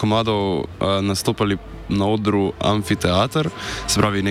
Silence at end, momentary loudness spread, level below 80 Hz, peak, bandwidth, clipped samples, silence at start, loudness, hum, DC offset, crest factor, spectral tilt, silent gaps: 0 s; 5 LU; -40 dBFS; -4 dBFS; 16 kHz; under 0.1%; 0 s; -20 LUFS; none; under 0.1%; 16 dB; -5 dB/octave; none